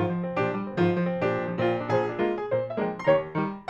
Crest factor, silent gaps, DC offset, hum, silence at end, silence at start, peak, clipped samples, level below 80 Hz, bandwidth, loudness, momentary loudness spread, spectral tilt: 18 dB; none; under 0.1%; none; 0.05 s; 0 s; -8 dBFS; under 0.1%; -60 dBFS; 7 kHz; -27 LUFS; 4 LU; -8.5 dB/octave